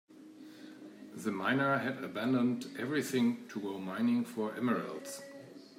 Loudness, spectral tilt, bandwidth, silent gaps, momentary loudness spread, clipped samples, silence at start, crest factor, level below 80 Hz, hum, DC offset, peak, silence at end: -34 LUFS; -5.5 dB/octave; 16 kHz; none; 20 LU; under 0.1%; 0.1 s; 16 dB; -84 dBFS; none; under 0.1%; -20 dBFS; 0.05 s